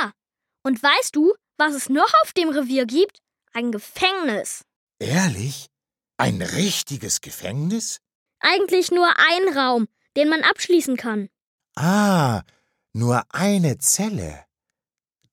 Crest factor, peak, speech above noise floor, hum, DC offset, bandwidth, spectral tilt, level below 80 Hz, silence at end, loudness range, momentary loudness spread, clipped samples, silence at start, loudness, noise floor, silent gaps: 18 dB; -4 dBFS; over 70 dB; none; under 0.1%; 17 kHz; -4 dB/octave; -56 dBFS; 0.9 s; 6 LU; 13 LU; under 0.1%; 0 s; -20 LUFS; under -90 dBFS; 4.76-4.87 s, 8.15-8.26 s, 11.42-11.58 s